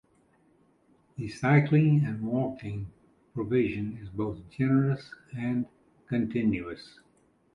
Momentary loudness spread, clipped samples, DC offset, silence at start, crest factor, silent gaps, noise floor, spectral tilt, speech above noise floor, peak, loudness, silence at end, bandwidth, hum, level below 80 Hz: 18 LU; under 0.1%; under 0.1%; 1.2 s; 20 dB; none; -66 dBFS; -9 dB/octave; 38 dB; -10 dBFS; -28 LUFS; 0.7 s; 9.6 kHz; none; -58 dBFS